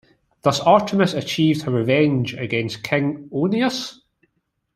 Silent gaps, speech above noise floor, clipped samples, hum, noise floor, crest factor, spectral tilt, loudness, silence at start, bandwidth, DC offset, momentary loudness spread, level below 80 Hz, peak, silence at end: none; 53 dB; under 0.1%; none; -72 dBFS; 18 dB; -6 dB/octave; -20 LUFS; 0.45 s; 13.5 kHz; under 0.1%; 8 LU; -58 dBFS; -2 dBFS; 0.85 s